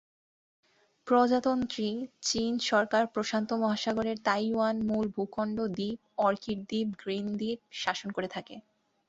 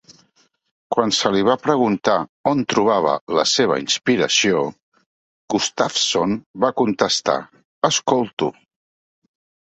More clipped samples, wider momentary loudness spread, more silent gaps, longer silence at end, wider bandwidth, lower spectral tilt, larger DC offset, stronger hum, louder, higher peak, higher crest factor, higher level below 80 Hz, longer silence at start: neither; about the same, 9 LU vs 7 LU; second, none vs 2.29-2.44 s, 3.21-3.27 s, 4.82-4.92 s, 5.06-5.48 s, 6.46-6.54 s, 7.65-7.82 s, 8.33-8.37 s; second, 0.5 s vs 1.1 s; about the same, 8 kHz vs 8.4 kHz; first, -4.5 dB/octave vs -3 dB/octave; neither; neither; second, -30 LUFS vs -19 LUFS; second, -12 dBFS vs 0 dBFS; about the same, 20 dB vs 20 dB; second, -66 dBFS vs -60 dBFS; first, 1.05 s vs 0.9 s